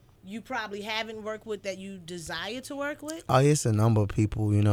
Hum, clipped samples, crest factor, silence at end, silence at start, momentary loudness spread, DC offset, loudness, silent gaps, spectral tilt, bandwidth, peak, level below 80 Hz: none; under 0.1%; 18 dB; 0 s; 0.25 s; 15 LU; under 0.1%; -28 LUFS; none; -6 dB/octave; 15 kHz; -8 dBFS; -50 dBFS